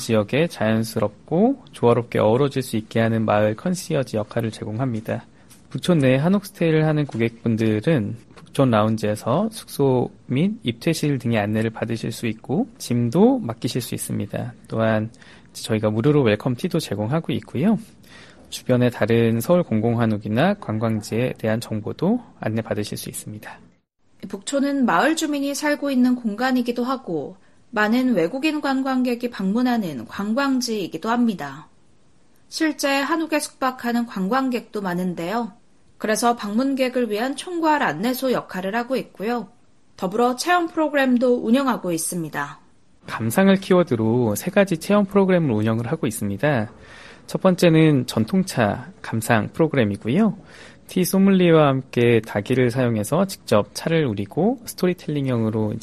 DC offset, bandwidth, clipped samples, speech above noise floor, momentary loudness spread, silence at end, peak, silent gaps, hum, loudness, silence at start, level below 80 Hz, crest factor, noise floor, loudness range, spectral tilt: 0.2%; 13.5 kHz; under 0.1%; 39 dB; 10 LU; 0 s; -2 dBFS; none; none; -21 LUFS; 0 s; -56 dBFS; 20 dB; -60 dBFS; 4 LU; -6 dB/octave